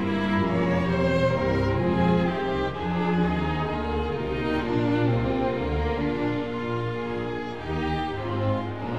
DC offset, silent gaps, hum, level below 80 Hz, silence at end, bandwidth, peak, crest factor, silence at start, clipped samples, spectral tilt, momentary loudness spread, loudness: 0.6%; none; none; -38 dBFS; 0 s; 8 kHz; -10 dBFS; 14 dB; 0 s; under 0.1%; -8 dB/octave; 6 LU; -26 LUFS